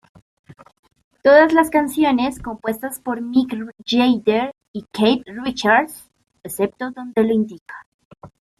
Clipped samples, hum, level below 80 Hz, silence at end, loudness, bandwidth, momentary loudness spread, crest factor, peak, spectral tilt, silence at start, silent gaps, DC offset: under 0.1%; none; -54 dBFS; 0.3 s; -18 LUFS; 15 kHz; 17 LU; 18 dB; -2 dBFS; -4.5 dB/octave; 0.5 s; 0.79-0.83 s, 1.04-1.11 s, 4.68-4.74 s, 7.61-7.66 s, 7.86-7.99 s, 8.05-8.11 s; under 0.1%